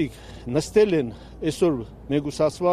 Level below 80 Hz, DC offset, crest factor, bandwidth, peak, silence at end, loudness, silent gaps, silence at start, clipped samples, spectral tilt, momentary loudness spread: -46 dBFS; under 0.1%; 16 dB; 14.5 kHz; -8 dBFS; 0 s; -24 LUFS; none; 0 s; under 0.1%; -6 dB/octave; 11 LU